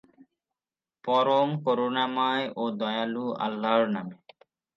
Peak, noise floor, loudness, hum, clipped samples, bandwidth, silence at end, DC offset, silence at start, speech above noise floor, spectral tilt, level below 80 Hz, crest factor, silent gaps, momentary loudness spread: -10 dBFS; under -90 dBFS; -27 LUFS; none; under 0.1%; 7.2 kHz; 0.6 s; under 0.1%; 1.05 s; over 64 dB; -7 dB/octave; -82 dBFS; 18 dB; none; 7 LU